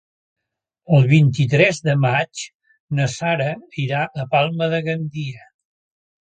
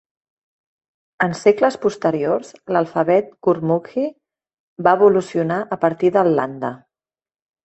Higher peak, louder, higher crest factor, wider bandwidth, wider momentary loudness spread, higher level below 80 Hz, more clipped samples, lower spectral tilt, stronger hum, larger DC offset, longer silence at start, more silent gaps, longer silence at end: about the same, -2 dBFS vs -2 dBFS; about the same, -19 LUFS vs -19 LUFS; about the same, 18 dB vs 18 dB; about the same, 9 kHz vs 8.4 kHz; first, 13 LU vs 10 LU; first, -58 dBFS vs -64 dBFS; neither; about the same, -6.5 dB/octave vs -7 dB/octave; neither; neither; second, 0.9 s vs 1.2 s; about the same, 2.54-2.60 s, 2.80-2.88 s vs 4.59-4.76 s; about the same, 0.85 s vs 0.9 s